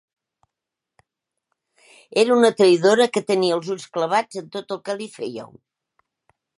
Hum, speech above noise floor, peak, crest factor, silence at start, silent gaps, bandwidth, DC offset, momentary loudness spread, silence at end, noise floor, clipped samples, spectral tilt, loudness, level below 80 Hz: none; 65 dB; -2 dBFS; 20 dB; 2.15 s; none; 11.5 kHz; under 0.1%; 16 LU; 1.1 s; -85 dBFS; under 0.1%; -4.5 dB/octave; -20 LUFS; -74 dBFS